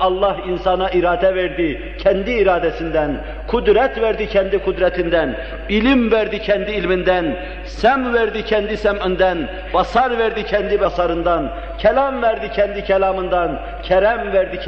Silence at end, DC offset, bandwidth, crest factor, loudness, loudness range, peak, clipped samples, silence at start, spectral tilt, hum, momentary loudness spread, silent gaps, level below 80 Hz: 0 s; 0.4%; 7.2 kHz; 16 dB; -18 LUFS; 1 LU; -2 dBFS; under 0.1%; 0 s; -7 dB/octave; none; 6 LU; none; -32 dBFS